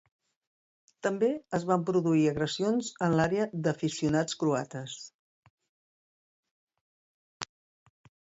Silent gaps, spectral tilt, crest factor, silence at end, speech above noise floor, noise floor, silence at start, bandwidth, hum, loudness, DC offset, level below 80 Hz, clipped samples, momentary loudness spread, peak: 5.14-5.43 s, 5.50-5.58 s, 5.69-6.43 s, 6.51-6.67 s, 6.81-7.40 s; -5.5 dB/octave; 20 dB; 0.85 s; over 62 dB; under -90 dBFS; 1.05 s; 8 kHz; none; -29 LUFS; under 0.1%; -64 dBFS; under 0.1%; 17 LU; -12 dBFS